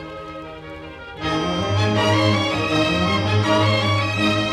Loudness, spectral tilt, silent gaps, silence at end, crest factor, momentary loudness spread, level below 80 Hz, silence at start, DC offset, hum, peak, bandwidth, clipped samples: -19 LUFS; -5.5 dB/octave; none; 0 s; 14 dB; 18 LU; -44 dBFS; 0 s; under 0.1%; none; -6 dBFS; 12 kHz; under 0.1%